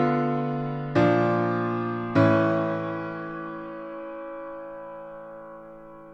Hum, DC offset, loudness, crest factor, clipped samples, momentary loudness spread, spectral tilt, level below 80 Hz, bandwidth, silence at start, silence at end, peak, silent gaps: none; under 0.1%; -26 LUFS; 18 dB; under 0.1%; 20 LU; -9 dB/octave; -60 dBFS; 7.6 kHz; 0 s; 0 s; -8 dBFS; none